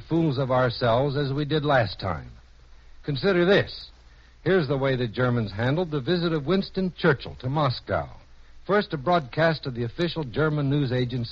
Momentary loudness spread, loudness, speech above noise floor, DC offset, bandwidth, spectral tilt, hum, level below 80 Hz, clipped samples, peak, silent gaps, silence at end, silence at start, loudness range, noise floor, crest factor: 9 LU; -25 LUFS; 27 dB; under 0.1%; 7 kHz; -5 dB/octave; none; -48 dBFS; under 0.1%; -8 dBFS; none; 0 s; 0 s; 1 LU; -51 dBFS; 16 dB